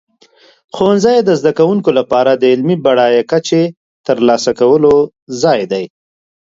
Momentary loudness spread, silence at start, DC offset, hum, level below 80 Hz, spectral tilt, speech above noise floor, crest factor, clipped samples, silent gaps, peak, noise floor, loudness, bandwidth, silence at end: 10 LU; 0.75 s; under 0.1%; none; -52 dBFS; -5.5 dB/octave; 37 dB; 12 dB; under 0.1%; 3.77-4.04 s, 5.22-5.27 s; 0 dBFS; -48 dBFS; -12 LUFS; 7.8 kHz; 0.65 s